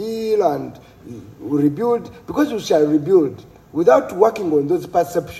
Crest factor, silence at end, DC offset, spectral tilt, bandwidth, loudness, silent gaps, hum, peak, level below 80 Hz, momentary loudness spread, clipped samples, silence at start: 18 dB; 0 s; under 0.1%; -6.5 dB/octave; 14.5 kHz; -18 LUFS; none; none; 0 dBFS; -54 dBFS; 15 LU; under 0.1%; 0 s